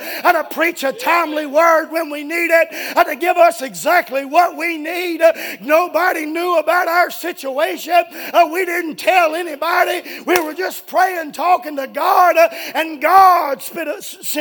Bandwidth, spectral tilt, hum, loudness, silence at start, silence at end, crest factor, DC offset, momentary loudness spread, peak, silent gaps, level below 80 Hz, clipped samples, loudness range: 19.5 kHz; -2 dB/octave; none; -16 LUFS; 0 s; 0 s; 16 dB; under 0.1%; 9 LU; 0 dBFS; none; -68 dBFS; under 0.1%; 2 LU